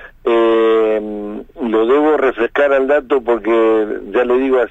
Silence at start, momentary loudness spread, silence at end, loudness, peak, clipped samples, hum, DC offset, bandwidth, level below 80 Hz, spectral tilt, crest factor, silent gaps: 0 s; 7 LU; 0 s; -14 LUFS; -2 dBFS; under 0.1%; none; under 0.1%; 7.4 kHz; -44 dBFS; -6.5 dB/octave; 12 dB; none